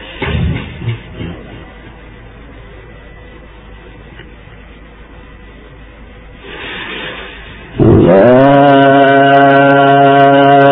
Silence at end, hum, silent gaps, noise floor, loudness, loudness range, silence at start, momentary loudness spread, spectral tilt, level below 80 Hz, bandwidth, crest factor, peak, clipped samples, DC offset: 0 s; none; none; -35 dBFS; -8 LUFS; 23 LU; 0 s; 21 LU; -10 dB/octave; -32 dBFS; 5 kHz; 12 dB; 0 dBFS; 0.2%; under 0.1%